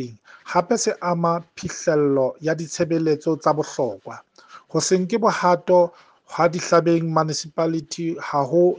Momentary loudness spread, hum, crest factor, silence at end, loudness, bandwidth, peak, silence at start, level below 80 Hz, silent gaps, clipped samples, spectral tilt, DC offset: 9 LU; none; 18 dB; 0 s; -21 LUFS; 10 kHz; -4 dBFS; 0 s; -64 dBFS; none; under 0.1%; -5 dB/octave; under 0.1%